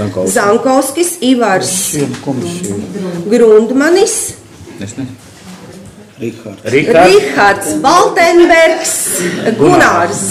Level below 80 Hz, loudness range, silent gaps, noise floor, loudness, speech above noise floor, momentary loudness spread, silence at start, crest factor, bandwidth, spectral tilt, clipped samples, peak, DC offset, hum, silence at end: -44 dBFS; 5 LU; none; -33 dBFS; -10 LUFS; 23 dB; 17 LU; 0 s; 10 dB; 16 kHz; -3.5 dB/octave; under 0.1%; 0 dBFS; under 0.1%; none; 0 s